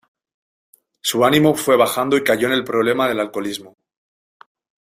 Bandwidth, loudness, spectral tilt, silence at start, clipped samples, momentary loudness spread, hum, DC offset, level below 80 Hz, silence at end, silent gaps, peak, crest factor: 16 kHz; -17 LUFS; -4 dB/octave; 1.05 s; under 0.1%; 10 LU; none; under 0.1%; -60 dBFS; 1.25 s; none; -2 dBFS; 18 dB